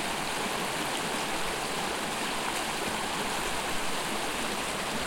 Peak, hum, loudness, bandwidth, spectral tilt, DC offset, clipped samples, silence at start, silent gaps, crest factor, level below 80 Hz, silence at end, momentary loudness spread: -16 dBFS; none; -30 LUFS; 16.5 kHz; -2 dB/octave; under 0.1%; under 0.1%; 0 s; none; 14 dB; -50 dBFS; 0 s; 1 LU